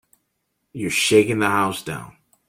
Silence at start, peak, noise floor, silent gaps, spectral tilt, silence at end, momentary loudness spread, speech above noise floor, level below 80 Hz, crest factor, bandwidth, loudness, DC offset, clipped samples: 0.75 s; -2 dBFS; -74 dBFS; none; -4 dB/octave; 0.4 s; 17 LU; 54 dB; -58 dBFS; 20 dB; 16.5 kHz; -19 LUFS; under 0.1%; under 0.1%